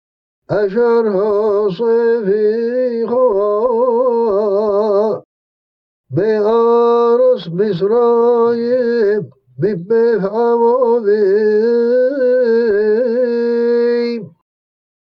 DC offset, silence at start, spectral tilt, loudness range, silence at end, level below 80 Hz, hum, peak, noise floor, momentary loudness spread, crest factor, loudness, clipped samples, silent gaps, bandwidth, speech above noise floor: under 0.1%; 0.5 s; -8.5 dB/octave; 2 LU; 0.9 s; -58 dBFS; none; -2 dBFS; under -90 dBFS; 6 LU; 12 dB; -14 LUFS; under 0.1%; 5.25-6.04 s; 5.6 kHz; over 77 dB